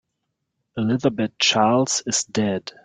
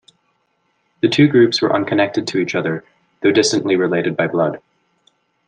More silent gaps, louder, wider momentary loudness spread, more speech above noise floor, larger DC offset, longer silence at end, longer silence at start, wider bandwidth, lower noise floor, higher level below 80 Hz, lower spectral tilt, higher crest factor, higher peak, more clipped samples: neither; second, -20 LUFS vs -16 LUFS; about the same, 8 LU vs 9 LU; first, 57 dB vs 50 dB; neither; second, 0.15 s vs 0.9 s; second, 0.75 s vs 1.05 s; about the same, 9.6 kHz vs 9.6 kHz; first, -78 dBFS vs -65 dBFS; about the same, -62 dBFS vs -62 dBFS; second, -3.5 dB/octave vs -5 dB/octave; about the same, 18 dB vs 16 dB; about the same, -4 dBFS vs -2 dBFS; neither